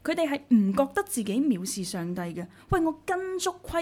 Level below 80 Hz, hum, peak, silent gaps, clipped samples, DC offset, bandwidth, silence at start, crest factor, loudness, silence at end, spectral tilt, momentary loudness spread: -50 dBFS; none; -12 dBFS; none; under 0.1%; under 0.1%; 17 kHz; 0.05 s; 16 dB; -27 LUFS; 0 s; -5 dB/octave; 9 LU